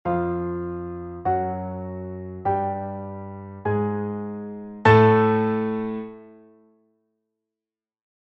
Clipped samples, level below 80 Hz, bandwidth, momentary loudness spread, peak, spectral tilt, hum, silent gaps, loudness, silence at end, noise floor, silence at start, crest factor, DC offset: under 0.1%; -54 dBFS; 7.2 kHz; 18 LU; -2 dBFS; -9 dB/octave; none; none; -23 LUFS; 1.85 s; under -90 dBFS; 0.05 s; 22 dB; under 0.1%